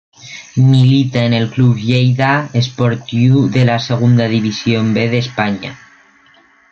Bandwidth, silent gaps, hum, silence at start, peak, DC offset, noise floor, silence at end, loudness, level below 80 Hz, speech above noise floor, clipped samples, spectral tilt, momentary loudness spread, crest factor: 7 kHz; none; none; 0.25 s; -2 dBFS; under 0.1%; -49 dBFS; 0.95 s; -13 LUFS; -48 dBFS; 36 dB; under 0.1%; -7 dB/octave; 7 LU; 12 dB